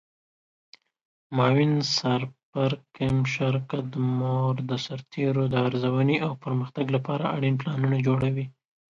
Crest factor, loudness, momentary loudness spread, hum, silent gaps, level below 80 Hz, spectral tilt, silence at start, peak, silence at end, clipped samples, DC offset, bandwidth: 16 dB; -26 LUFS; 7 LU; none; 2.43-2.53 s; -58 dBFS; -6.5 dB/octave; 1.3 s; -10 dBFS; 0.4 s; under 0.1%; under 0.1%; 7.6 kHz